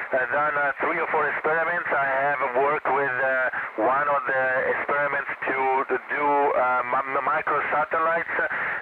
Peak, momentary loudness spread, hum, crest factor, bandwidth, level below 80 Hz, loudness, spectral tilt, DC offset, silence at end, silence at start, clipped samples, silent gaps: -14 dBFS; 3 LU; none; 10 dB; 5 kHz; -66 dBFS; -23 LUFS; -7 dB/octave; under 0.1%; 0 s; 0 s; under 0.1%; none